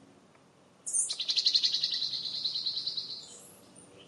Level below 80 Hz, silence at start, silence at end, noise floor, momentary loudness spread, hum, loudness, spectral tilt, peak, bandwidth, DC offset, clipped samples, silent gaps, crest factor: -84 dBFS; 0.85 s; 0.05 s; -61 dBFS; 17 LU; none; -29 LUFS; 1.5 dB/octave; -12 dBFS; 13.5 kHz; under 0.1%; under 0.1%; none; 22 dB